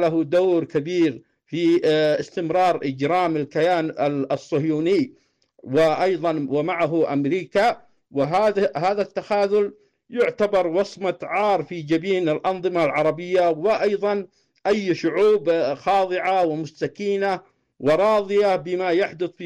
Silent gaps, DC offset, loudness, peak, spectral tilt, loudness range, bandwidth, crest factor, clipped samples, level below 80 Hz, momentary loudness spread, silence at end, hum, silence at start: none; under 0.1%; -21 LUFS; -12 dBFS; -6.5 dB/octave; 1 LU; 10.5 kHz; 10 dB; under 0.1%; -62 dBFS; 7 LU; 0 s; none; 0 s